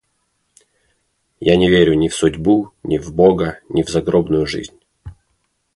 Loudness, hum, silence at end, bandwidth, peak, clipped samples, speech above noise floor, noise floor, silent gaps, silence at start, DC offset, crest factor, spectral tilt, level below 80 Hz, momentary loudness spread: -16 LUFS; none; 0.65 s; 11.5 kHz; 0 dBFS; under 0.1%; 52 dB; -67 dBFS; none; 1.4 s; under 0.1%; 16 dB; -6 dB/octave; -40 dBFS; 10 LU